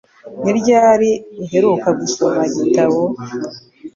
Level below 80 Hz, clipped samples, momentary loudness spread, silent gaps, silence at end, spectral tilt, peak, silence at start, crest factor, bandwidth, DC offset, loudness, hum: -58 dBFS; under 0.1%; 15 LU; none; 0.05 s; -5.5 dB/octave; -2 dBFS; 0.25 s; 14 dB; 7.6 kHz; under 0.1%; -15 LUFS; none